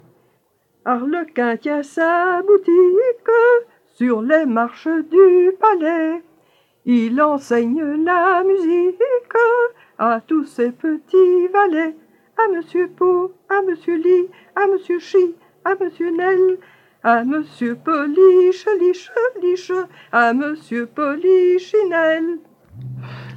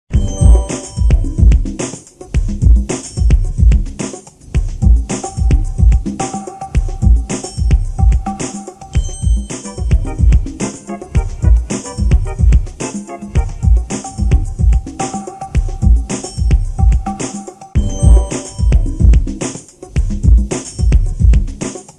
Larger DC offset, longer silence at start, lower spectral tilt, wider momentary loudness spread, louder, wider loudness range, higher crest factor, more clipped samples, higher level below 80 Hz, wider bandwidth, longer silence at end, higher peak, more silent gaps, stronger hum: neither; first, 0.85 s vs 0.1 s; about the same, -6.5 dB/octave vs -6.5 dB/octave; about the same, 10 LU vs 11 LU; about the same, -17 LUFS vs -16 LUFS; about the same, 3 LU vs 3 LU; about the same, 16 dB vs 12 dB; neither; second, -74 dBFS vs -14 dBFS; second, 7.6 kHz vs 10 kHz; about the same, 0 s vs 0.1 s; about the same, -2 dBFS vs 0 dBFS; neither; neither